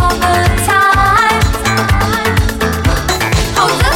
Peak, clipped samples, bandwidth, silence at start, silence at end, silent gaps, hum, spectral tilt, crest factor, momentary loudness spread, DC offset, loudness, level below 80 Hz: 0 dBFS; under 0.1%; 17.5 kHz; 0 s; 0 s; none; none; -4 dB/octave; 10 dB; 5 LU; under 0.1%; -11 LUFS; -20 dBFS